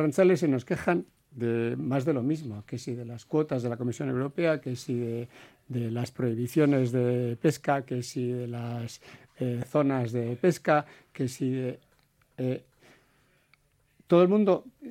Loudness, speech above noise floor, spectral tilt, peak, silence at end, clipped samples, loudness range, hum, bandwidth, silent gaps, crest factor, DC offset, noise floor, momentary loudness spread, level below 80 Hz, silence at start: -28 LUFS; 39 dB; -7.5 dB/octave; -8 dBFS; 0 s; under 0.1%; 3 LU; none; 16 kHz; none; 20 dB; under 0.1%; -66 dBFS; 14 LU; -68 dBFS; 0 s